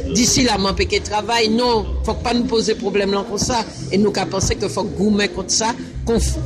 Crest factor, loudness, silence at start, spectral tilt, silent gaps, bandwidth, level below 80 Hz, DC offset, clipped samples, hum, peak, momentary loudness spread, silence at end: 14 dB; -18 LUFS; 0 s; -4 dB/octave; none; 13.5 kHz; -30 dBFS; under 0.1%; under 0.1%; none; -4 dBFS; 7 LU; 0 s